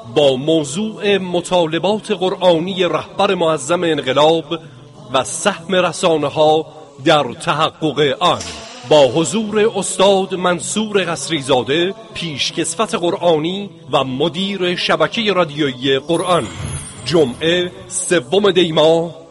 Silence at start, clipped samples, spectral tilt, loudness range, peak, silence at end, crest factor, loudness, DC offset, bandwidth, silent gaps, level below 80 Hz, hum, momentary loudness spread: 0 s; under 0.1%; -4 dB/octave; 2 LU; 0 dBFS; 0.05 s; 16 dB; -16 LUFS; under 0.1%; 11.5 kHz; none; -50 dBFS; none; 7 LU